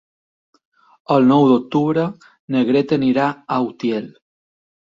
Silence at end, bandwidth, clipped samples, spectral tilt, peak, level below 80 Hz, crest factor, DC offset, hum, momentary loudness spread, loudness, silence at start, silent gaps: 0.85 s; 7.2 kHz; under 0.1%; -8 dB/octave; -2 dBFS; -60 dBFS; 16 dB; under 0.1%; none; 10 LU; -17 LUFS; 1.1 s; 2.39-2.48 s